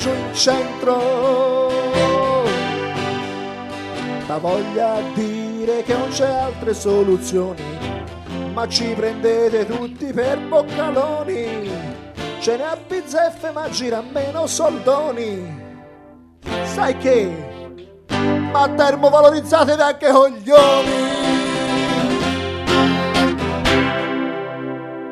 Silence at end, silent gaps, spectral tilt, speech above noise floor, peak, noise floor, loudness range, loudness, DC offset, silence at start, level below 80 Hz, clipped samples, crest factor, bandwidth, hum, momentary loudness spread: 0 s; none; -4.5 dB/octave; 27 dB; 0 dBFS; -44 dBFS; 8 LU; -18 LUFS; under 0.1%; 0 s; -44 dBFS; under 0.1%; 18 dB; 13 kHz; none; 14 LU